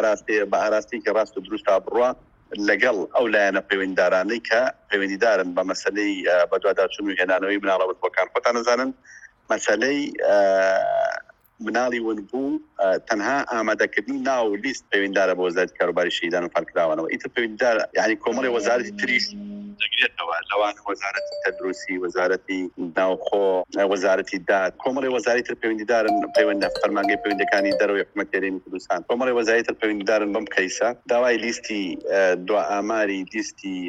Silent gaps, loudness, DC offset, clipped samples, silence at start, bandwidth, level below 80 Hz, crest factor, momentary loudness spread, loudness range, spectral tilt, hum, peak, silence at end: none; -22 LUFS; under 0.1%; under 0.1%; 0 s; 10 kHz; -62 dBFS; 18 dB; 7 LU; 2 LU; -3.5 dB/octave; none; -4 dBFS; 0 s